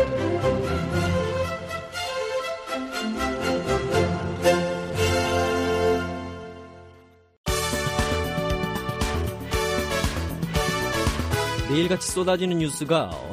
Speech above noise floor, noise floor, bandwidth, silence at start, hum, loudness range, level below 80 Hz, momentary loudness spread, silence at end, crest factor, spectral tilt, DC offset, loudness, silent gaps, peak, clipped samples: 28 dB; -52 dBFS; 15.5 kHz; 0 s; none; 3 LU; -38 dBFS; 7 LU; 0 s; 16 dB; -5 dB/octave; under 0.1%; -25 LUFS; 7.37-7.44 s; -8 dBFS; under 0.1%